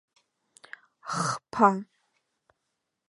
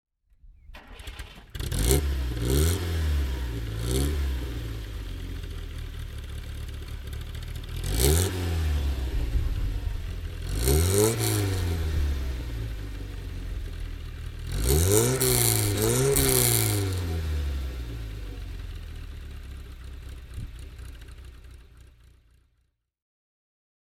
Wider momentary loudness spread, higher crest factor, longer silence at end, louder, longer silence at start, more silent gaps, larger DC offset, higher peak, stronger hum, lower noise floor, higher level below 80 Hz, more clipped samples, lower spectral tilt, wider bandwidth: first, 25 LU vs 20 LU; about the same, 26 dB vs 26 dB; second, 1.25 s vs 2 s; about the same, -26 LUFS vs -27 LUFS; first, 1.05 s vs 0.45 s; neither; neither; second, -6 dBFS vs -2 dBFS; neither; first, -82 dBFS vs -72 dBFS; second, -74 dBFS vs -32 dBFS; neither; about the same, -5 dB/octave vs -4.5 dB/octave; second, 11.5 kHz vs 18 kHz